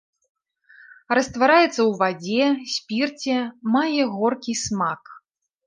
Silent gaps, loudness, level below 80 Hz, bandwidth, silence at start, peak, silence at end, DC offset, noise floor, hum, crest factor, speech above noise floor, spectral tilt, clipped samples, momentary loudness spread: none; -21 LUFS; -60 dBFS; 10 kHz; 1.1 s; -4 dBFS; 0.5 s; under 0.1%; -56 dBFS; none; 18 dB; 34 dB; -4 dB/octave; under 0.1%; 9 LU